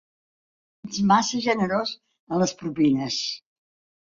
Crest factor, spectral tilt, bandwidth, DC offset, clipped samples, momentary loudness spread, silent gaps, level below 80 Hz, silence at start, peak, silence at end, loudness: 20 dB; -4.5 dB/octave; 7.6 kHz; under 0.1%; under 0.1%; 14 LU; 2.19-2.27 s; -62 dBFS; 0.85 s; -6 dBFS; 0.8 s; -24 LUFS